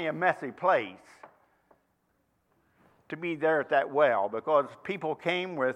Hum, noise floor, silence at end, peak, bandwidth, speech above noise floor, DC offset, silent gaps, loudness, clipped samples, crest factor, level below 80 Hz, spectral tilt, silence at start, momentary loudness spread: none; -73 dBFS; 0 s; -10 dBFS; 9.6 kHz; 45 dB; under 0.1%; none; -28 LUFS; under 0.1%; 20 dB; -80 dBFS; -6 dB/octave; 0 s; 10 LU